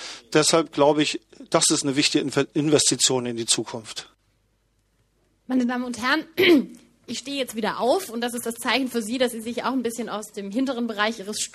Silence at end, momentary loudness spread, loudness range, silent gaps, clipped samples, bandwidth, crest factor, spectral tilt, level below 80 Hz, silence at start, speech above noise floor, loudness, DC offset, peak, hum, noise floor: 0.05 s; 12 LU; 5 LU; none; under 0.1%; 14.5 kHz; 20 dB; -3 dB/octave; -64 dBFS; 0 s; 44 dB; -22 LUFS; under 0.1%; -4 dBFS; none; -67 dBFS